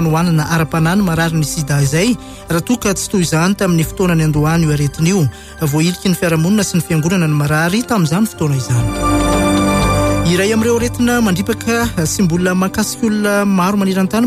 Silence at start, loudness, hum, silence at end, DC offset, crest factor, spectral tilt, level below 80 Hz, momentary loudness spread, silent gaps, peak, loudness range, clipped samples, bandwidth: 0 s; -14 LUFS; none; 0 s; under 0.1%; 10 dB; -5.5 dB/octave; -30 dBFS; 3 LU; none; -4 dBFS; 1 LU; under 0.1%; 16 kHz